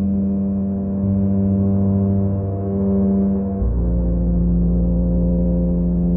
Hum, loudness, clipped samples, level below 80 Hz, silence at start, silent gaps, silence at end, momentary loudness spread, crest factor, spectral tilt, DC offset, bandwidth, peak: none; -19 LUFS; under 0.1%; -24 dBFS; 0 s; none; 0 s; 4 LU; 10 dB; -17 dB/octave; under 0.1%; 1.9 kHz; -8 dBFS